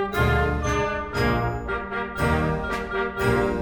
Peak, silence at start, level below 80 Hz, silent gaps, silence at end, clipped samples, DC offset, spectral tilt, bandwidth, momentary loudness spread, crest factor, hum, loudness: -8 dBFS; 0 s; -32 dBFS; none; 0 s; under 0.1%; under 0.1%; -6.5 dB/octave; 19 kHz; 6 LU; 16 dB; none; -24 LUFS